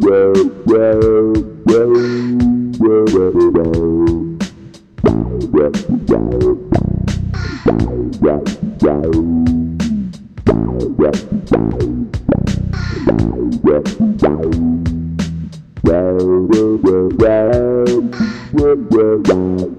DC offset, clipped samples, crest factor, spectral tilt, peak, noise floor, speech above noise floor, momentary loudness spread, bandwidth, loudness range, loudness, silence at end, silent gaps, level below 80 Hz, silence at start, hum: 0.2%; under 0.1%; 14 dB; -8 dB/octave; 0 dBFS; -37 dBFS; 27 dB; 8 LU; 9.4 kHz; 4 LU; -14 LUFS; 0 s; none; -30 dBFS; 0 s; none